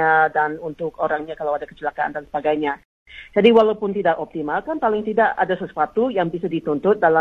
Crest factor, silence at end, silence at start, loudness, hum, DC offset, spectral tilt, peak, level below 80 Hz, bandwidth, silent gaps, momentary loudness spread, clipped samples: 16 dB; 0 s; 0 s; -20 LUFS; none; under 0.1%; -7.5 dB/octave; -2 dBFS; -56 dBFS; 5.2 kHz; 2.85-3.06 s; 10 LU; under 0.1%